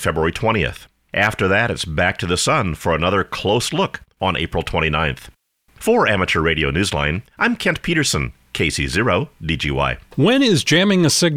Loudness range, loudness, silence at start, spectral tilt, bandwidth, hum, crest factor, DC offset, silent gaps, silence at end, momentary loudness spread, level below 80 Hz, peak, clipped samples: 2 LU; -18 LUFS; 0 s; -4.5 dB/octave; 16.5 kHz; none; 16 dB; under 0.1%; none; 0 s; 8 LU; -36 dBFS; -4 dBFS; under 0.1%